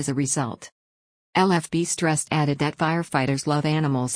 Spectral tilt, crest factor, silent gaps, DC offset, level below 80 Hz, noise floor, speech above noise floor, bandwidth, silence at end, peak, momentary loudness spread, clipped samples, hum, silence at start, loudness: -5 dB/octave; 16 dB; 0.72-1.33 s; under 0.1%; -60 dBFS; under -90 dBFS; over 67 dB; 10.5 kHz; 0 s; -8 dBFS; 5 LU; under 0.1%; none; 0 s; -23 LUFS